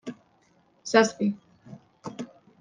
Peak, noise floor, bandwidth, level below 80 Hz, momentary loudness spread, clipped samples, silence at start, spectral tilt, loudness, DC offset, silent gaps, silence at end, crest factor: -4 dBFS; -64 dBFS; 9.8 kHz; -76 dBFS; 21 LU; under 0.1%; 0.05 s; -4.5 dB/octave; -24 LUFS; under 0.1%; none; 0.35 s; 24 dB